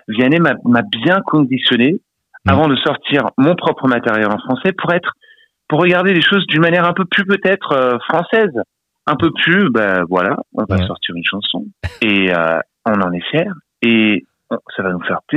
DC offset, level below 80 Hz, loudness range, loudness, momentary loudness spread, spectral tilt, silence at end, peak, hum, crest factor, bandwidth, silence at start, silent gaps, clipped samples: under 0.1%; -48 dBFS; 3 LU; -15 LUFS; 9 LU; -7.5 dB/octave; 0 s; 0 dBFS; none; 14 dB; 8.2 kHz; 0.1 s; none; under 0.1%